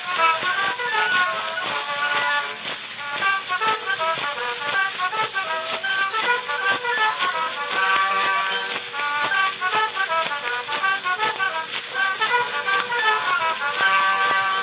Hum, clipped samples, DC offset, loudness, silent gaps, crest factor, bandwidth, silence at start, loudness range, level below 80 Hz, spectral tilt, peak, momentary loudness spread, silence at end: none; under 0.1%; under 0.1%; -21 LUFS; none; 18 dB; 4 kHz; 0 s; 2 LU; -78 dBFS; -5 dB/octave; -6 dBFS; 6 LU; 0 s